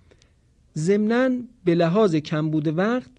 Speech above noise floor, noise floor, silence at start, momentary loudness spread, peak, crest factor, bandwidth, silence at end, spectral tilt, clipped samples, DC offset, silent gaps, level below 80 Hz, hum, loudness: 38 dB; -59 dBFS; 0.75 s; 6 LU; -8 dBFS; 14 dB; 10 kHz; 0.15 s; -7 dB/octave; under 0.1%; under 0.1%; none; -60 dBFS; none; -22 LUFS